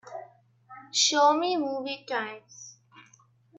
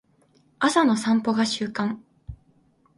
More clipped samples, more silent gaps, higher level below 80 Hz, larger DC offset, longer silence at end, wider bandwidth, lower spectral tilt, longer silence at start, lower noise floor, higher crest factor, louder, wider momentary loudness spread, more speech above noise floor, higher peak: neither; neither; second, -84 dBFS vs -54 dBFS; neither; first, 0.9 s vs 0.65 s; second, 8.4 kHz vs 11.5 kHz; second, -0.5 dB/octave vs -4.5 dB/octave; second, 0.05 s vs 0.6 s; about the same, -61 dBFS vs -62 dBFS; about the same, 18 dB vs 20 dB; about the same, -25 LUFS vs -23 LUFS; about the same, 25 LU vs 24 LU; second, 34 dB vs 39 dB; second, -10 dBFS vs -4 dBFS